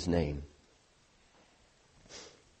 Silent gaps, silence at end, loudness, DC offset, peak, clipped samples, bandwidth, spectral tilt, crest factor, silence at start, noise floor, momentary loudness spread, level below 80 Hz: none; 0.3 s; -38 LUFS; under 0.1%; -16 dBFS; under 0.1%; 8.4 kHz; -6.5 dB/octave; 24 dB; 0 s; -67 dBFS; 22 LU; -50 dBFS